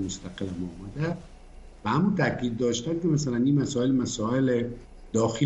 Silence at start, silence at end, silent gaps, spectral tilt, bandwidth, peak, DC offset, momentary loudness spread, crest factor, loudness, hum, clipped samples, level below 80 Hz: 0 s; 0 s; none; -6 dB/octave; 8.6 kHz; -10 dBFS; under 0.1%; 11 LU; 16 dB; -27 LUFS; none; under 0.1%; -50 dBFS